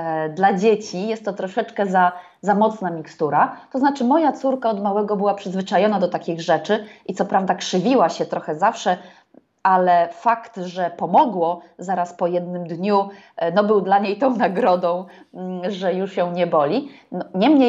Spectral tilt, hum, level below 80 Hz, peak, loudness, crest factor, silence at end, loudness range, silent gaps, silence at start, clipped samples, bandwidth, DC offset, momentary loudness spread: -6 dB/octave; none; -74 dBFS; -4 dBFS; -20 LUFS; 16 dB; 0 s; 1 LU; none; 0 s; under 0.1%; 8 kHz; under 0.1%; 10 LU